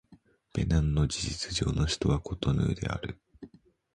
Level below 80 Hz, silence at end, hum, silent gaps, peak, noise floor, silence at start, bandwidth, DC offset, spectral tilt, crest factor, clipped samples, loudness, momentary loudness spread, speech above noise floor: -38 dBFS; 0.5 s; none; none; -14 dBFS; -60 dBFS; 0.1 s; 11 kHz; under 0.1%; -5.5 dB/octave; 18 dB; under 0.1%; -30 LUFS; 10 LU; 32 dB